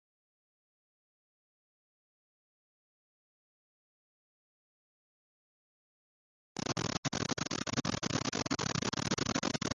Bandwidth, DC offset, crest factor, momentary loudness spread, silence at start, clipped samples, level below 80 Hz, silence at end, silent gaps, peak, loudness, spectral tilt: 11 kHz; under 0.1%; 22 dB; 2 LU; 6.55 s; under 0.1%; -62 dBFS; 0 s; 6.98-7.03 s; -18 dBFS; -35 LUFS; -3.5 dB/octave